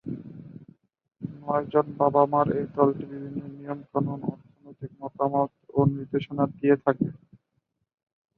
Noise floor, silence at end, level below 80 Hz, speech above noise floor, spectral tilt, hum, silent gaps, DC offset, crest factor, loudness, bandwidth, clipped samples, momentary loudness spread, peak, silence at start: -77 dBFS; 1.2 s; -62 dBFS; 52 dB; -11.5 dB/octave; none; none; under 0.1%; 22 dB; -26 LUFS; 4.4 kHz; under 0.1%; 17 LU; -4 dBFS; 0.05 s